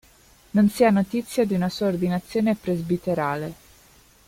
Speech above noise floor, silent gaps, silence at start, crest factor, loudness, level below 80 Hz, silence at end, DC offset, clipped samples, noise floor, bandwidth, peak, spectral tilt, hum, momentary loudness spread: 32 dB; none; 0.55 s; 18 dB; -23 LUFS; -54 dBFS; 0.75 s; under 0.1%; under 0.1%; -54 dBFS; 16 kHz; -6 dBFS; -7 dB/octave; none; 7 LU